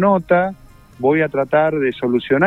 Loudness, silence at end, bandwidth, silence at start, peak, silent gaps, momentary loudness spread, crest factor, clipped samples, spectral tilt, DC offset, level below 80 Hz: -17 LUFS; 0 s; 5.6 kHz; 0 s; -2 dBFS; none; 5 LU; 14 dB; under 0.1%; -8.5 dB/octave; under 0.1%; -50 dBFS